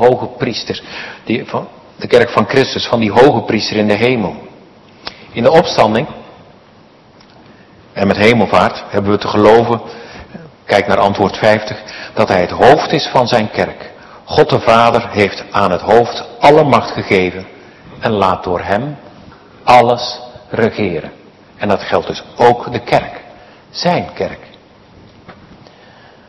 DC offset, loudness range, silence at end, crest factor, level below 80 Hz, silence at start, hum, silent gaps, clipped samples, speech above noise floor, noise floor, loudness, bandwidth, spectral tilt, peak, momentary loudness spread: under 0.1%; 5 LU; 0.95 s; 14 dB; -46 dBFS; 0 s; none; none; 1%; 31 dB; -43 dBFS; -13 LUFS; 12 kHz; -6 dB/octave; 0 dBFS; 19 LU